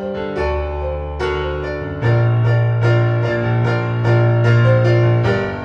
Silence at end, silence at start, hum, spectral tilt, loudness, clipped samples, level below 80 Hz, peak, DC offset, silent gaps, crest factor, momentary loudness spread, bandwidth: 0 s; 0 s; none; -8.5 dB/octave; -17 LUFS; under 0.1%; -32 dBFS; -2 dBFS; under 0.1%; none; 14 dB; 10 LU; 6.2 kHz